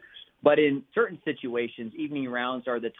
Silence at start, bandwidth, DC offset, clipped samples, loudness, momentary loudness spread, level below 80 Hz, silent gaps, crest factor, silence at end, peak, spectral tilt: 0.15 s; 4 kHz; under 0.1%; under 0.1%; -27 LUFS; 11 LU; -74 dBFS; none; 20 dB; 0.1 s; -8 dBFS; -8.5 dB/octave